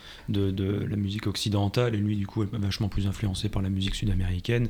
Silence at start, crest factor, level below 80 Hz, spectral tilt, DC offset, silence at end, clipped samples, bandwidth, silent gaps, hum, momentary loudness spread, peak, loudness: 0 s; 16 dB; -38 dBFS; -6.5 dB/octave; under 0.1%; 0 s; under 0.1%; 15.5 kHz; none; none; 4 LU; -12 dBFS; -28 LUFS